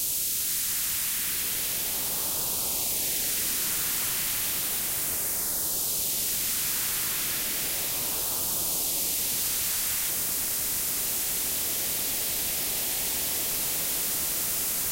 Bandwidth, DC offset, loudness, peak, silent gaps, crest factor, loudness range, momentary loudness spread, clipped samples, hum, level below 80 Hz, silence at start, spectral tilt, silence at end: 16 kHz; under 0.1%; -25 LUFS; -14 dBFS; none; 14 dB; 0 LU; 1 LU; under 0.1%; none; -54 dBFS; 0 s; 0 dB/octave; 0 s